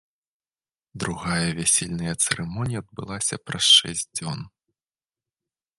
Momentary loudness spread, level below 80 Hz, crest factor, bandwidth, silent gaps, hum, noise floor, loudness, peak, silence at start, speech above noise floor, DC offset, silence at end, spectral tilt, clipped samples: 17 LU; -52 dBFS; 24 dB; 12 kHz; none; none; under -90 dBFS; -22 LUFS; -2 dBFS; 0.95 s; over 66 dB; under 0.1%; 1.3 s; -2 dB/octave; under 0.1%